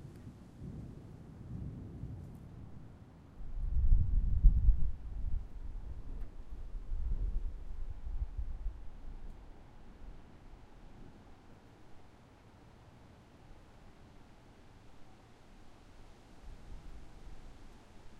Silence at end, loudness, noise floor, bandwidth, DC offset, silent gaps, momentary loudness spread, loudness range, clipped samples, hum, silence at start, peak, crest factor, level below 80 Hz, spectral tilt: 0 s; -40 LUFS; -59 dBFS; 4.1 kHz; under 0.1%; none; 26 LU; 23 LU; under 0.1%; none; 0 s; -10 dBFS; 26 dB; -38 dBFS; -8.5 dB/octave